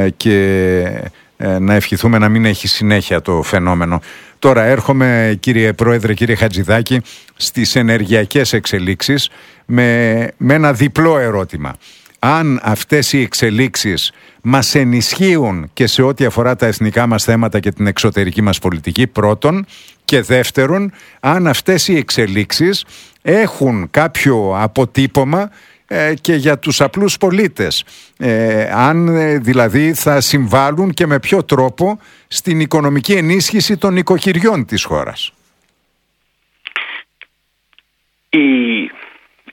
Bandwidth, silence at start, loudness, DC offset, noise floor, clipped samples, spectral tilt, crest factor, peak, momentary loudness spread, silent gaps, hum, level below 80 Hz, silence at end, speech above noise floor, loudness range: 18.5 kHz; 0 s; -13 LUFS; under 0.1%; -64 dBFS; 0.1%; -5 dB/octave; 14 dB; 0 dBFS; 8 LU; none; none; -42 dBFS; 0.45 s; 51 dB; 2 LU